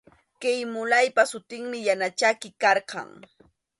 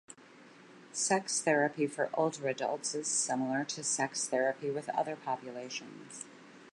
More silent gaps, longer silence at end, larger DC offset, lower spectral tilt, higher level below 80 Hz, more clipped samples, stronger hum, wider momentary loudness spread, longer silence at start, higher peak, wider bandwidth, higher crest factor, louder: neither; first, 0.75 s vs 0.05 s; neither; about the same, -2 dB/octave vs -2.5 dB/octave; first, -74 dBFS vs -88 dBFS; neither; neither; about the same, 14 LU vs 16 LU; first, 0.4 s vs 0.1 s; first, -6 dBFS vs -16 dBFS; about the same, 11.5 kHz vs 11.5 kHz; about the same, 20 dB vs 20 dB; first, -24 LUFS vs -33 LUFS